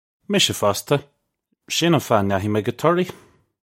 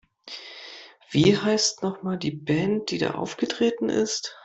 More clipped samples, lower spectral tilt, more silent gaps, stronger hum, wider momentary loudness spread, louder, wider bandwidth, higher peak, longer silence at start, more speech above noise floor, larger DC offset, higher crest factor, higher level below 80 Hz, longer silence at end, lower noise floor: neither; about the same, -4.5 dB/octave vs -4.5 dB/octave; neither; neither; second, 6 LU vs 19 LU; first, -20 LUFS vs -24 LUFS; first, 16.5 kHz vs 8.2 kHz; first, -2 dBFS vs -6 dBFS; about the same, 0.3 s vs 0.25 s; first, 53 dB vs 21 dB; neither; about the same, 20 dB vs 20 dB; about the same, -60 dBFS vs -58 dBFS; first, 0.55 s vs 0.05 s; first, -73 dBFS vs -45 dBFS